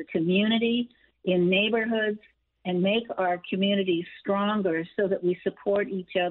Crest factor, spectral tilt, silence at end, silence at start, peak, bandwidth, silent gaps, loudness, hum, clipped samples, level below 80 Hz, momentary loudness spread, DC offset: 14 dB; -4 dB/octave; 0 s; 0 s; -12 dBFS; 4.2 kHz; none; -26 LUFS; none; under 0.1%; -68 dBFS; 7 LU; under 0.1%